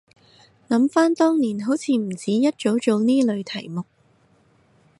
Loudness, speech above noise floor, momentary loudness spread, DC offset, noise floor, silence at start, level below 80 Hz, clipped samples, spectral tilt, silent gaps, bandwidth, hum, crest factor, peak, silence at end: -21 LUFS; 39 dB; 12 LU; under 0.1%; -59 dBFS; 0.7 s; -70 dBFS; under 0.1%; -5.5 dB/octave; none; 11.5 kHz; none; 16 dB; -6 dBFS; 1.15 s